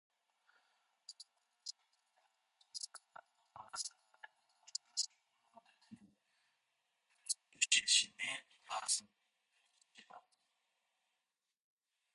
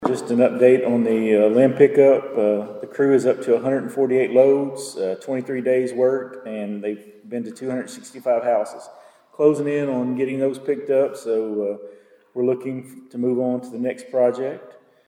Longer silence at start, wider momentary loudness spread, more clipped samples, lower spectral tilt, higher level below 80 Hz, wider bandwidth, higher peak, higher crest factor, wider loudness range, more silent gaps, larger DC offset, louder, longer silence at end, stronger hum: first, 1.1 s vs 0 s; first, 26 LU vs 15 LU; neither; second, 3 dB/octave vs -7 dB/octave; second, under -90 dBFS vs -76 dBFS; second, 11.5 kHz vs 13 kHz; second, -16 dBFS vs -2 dBFS; first, 30 dB vs 18 dB; first, 15 LU vs 7 LU; neither; neither; second, -37 LUFS vs -20 LUFS; first, 1.95 s vs 0.35 s; neither